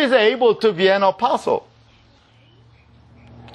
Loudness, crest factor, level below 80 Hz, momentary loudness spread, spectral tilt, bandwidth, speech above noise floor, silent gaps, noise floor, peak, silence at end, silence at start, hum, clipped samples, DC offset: -17 LUFS; 16 dB; -60 dBFS; 7 LU; -5 dB/octave; 10.5 kHz; 36 dB; none; -52 dBFS; -4 dBFS; 1.95 s; 0 s; none; under 0.1%; under 0.1%